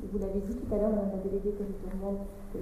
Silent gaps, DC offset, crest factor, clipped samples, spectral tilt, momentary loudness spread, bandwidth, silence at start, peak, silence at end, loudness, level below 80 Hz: none; under 0.1%; 16 dB; under 0.1%; -9.5 dB/octave; 8 LU; 14.5 kHz; 0 s; -16 dBFS; 0 s; -34 LUFS; -42 dBFS